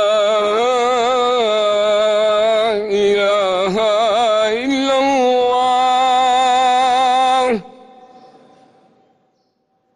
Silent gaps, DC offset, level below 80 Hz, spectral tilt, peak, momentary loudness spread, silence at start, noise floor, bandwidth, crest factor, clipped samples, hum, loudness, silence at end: none; under 0.1%; -56 dBFS; -3 dB/octave; -6 dBFS; 3 LU; 0 s; -64 dBFS; 11.5 kHz; 10 dB; under 0.1%; none; -15 LUFS; 2.3 s